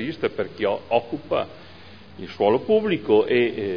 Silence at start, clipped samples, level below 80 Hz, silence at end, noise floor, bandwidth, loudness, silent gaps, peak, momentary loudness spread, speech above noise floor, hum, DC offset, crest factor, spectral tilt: 0 s; under 0.1%; -60 dBFS; 0 s; -45 dBFS; 5.4 kHz; -22 LUFS; none; -6 dBFS; 9 LU; 23 dB; none; 0.4%; 18 dB; -8 dB/octave